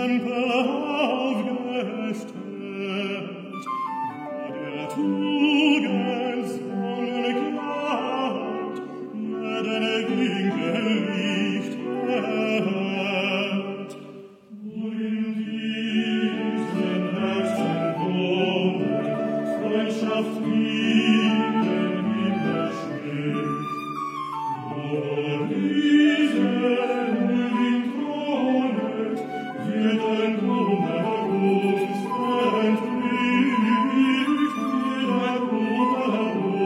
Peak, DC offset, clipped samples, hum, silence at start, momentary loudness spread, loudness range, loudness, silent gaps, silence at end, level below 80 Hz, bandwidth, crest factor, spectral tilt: -8 dBFS; under 0.1%; under 0.1%; none; 0 s; 10 LU; 6 LU; -24 LUFS; none; 0 s; -82 dBFS; 11.5 kHz; 16 dB; -6.5 dB/octave